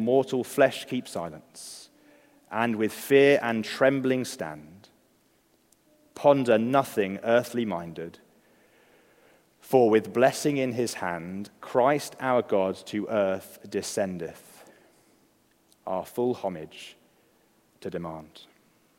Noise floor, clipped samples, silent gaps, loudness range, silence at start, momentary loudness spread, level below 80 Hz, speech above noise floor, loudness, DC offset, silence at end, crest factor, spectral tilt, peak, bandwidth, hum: -65 dBFS; under 0.1%; none; 10 LU; 0 s; 19 LU; -74 dBFS; 40 dB; -26 LUFS; under 0.1%; 0.55 s; 22 dB; -5 dB/octave; -6 dBFS; 16 kHz; none